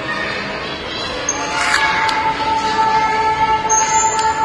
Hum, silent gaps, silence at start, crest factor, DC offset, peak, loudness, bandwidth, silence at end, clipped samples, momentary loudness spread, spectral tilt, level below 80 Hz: none; none; 0 s; 16 dB; under 0.1%; 0 dBFS; -16 LUFS; 11 kHz; 0 s; under 0.1%; 8 LU; -1.5 dB/octave; -42 dBFS